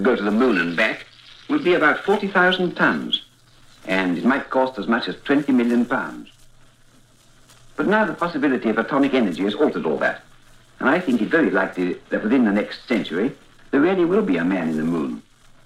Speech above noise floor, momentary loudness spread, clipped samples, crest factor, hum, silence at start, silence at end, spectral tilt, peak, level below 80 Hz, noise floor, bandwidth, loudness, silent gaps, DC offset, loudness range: 32 dB; 8 LU; under 0.1%; 16 dB; none; 0 s; 0.45 s; -6 dB/octave; -4 dBFS; -54 dBFS; -52 dBFS; 12 kHz; -20 LUFS; none; under 0.1%; 3 LU